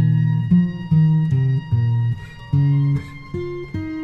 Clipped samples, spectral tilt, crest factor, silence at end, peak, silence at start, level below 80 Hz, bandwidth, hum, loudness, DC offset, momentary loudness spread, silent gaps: under 0.1%; -10 dB/octave; 12 dB; 0 s; -6 dBFS; 0 s; -44 dBFS; 5 kHz; none; -19 LUFS; under 0.1%; 12 LU; none